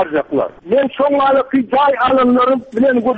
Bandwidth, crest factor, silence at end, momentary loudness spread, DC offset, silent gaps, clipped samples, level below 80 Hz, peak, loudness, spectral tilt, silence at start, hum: 4.7 kHz; 8 dB; 0 s; 5 LU; under 0.1%; none; under 0.1%; -50 dBFS; -4 dBFS; -14 LUFS; -7.5 dB/octave; 0 s; none